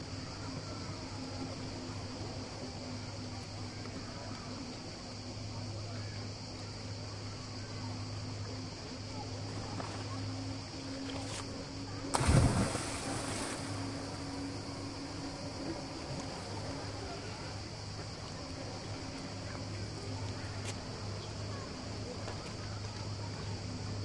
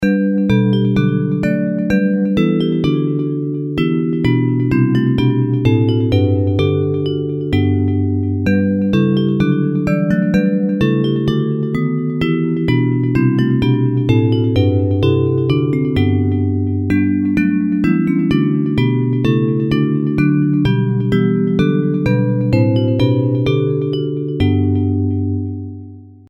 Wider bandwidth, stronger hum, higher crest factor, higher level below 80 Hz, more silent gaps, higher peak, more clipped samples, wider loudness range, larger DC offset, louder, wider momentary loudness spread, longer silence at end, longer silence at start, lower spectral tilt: first, 11.5 kHz vs 7.4 kHz; neither; first, 28 dB vs 14 dB; second, -52 dBFS vs -40 dBFS; neither; second, -12 dBFS vs 0 dBFS; neither; first, 8 LU vs 1 LU; neither; second, -40 LUFS vs -16 LUFS; about the same, 6 LU vs 4 LU; second, 0 s vs 0.2 s; about the same, 0 s vs 0 s; second, -5 dB/octave vs -9 dB/octave